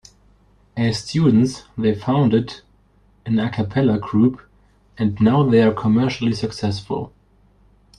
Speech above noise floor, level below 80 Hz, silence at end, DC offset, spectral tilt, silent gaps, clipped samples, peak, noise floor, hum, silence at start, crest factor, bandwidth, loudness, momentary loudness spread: 38 dB; -50 dBFS; 0.9 s; under 0.1%; -7.5 dB/octave; none; under 0.1%; -4 dBFS; -56 dBFS; 50 Hz at -45 dBFS; 0.75 s; 16 dB; 10.5 kHz; -19 LUFS; 12 LU